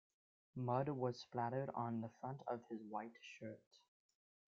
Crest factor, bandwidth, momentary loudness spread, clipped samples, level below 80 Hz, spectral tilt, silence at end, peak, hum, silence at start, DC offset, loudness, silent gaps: 22 dB; 7.4 kHz; 13 LU; under 0.1%; -86 dBFS; -6.5 dB/octave; 0.75 s; -24 dBFS; none; 0.55 s; under 0.1%; -46 LUFS; 3.67-3.71 s